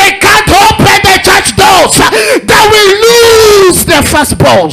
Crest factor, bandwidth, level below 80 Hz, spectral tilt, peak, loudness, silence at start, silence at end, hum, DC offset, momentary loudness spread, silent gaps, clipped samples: 4 dB; 16 kHz; -26 dBFS; -3 dB/octave; 0 dBFS; -3 LUFS; 0 s; 0 s; none; under 0.1%; 3 LU; none; 0.8%